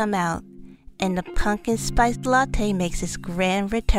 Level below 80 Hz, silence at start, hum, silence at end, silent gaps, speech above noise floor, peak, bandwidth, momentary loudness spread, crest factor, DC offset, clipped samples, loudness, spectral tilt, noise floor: -30 dBFS; 0 s; none; 0 s; none; 21 dB; -6 dBFS; 15.5 kHz; 7 LU; 16 dB; under 0.1%; under 0.1%; -24 LUFS; -5 dB/octave; -43 dBFS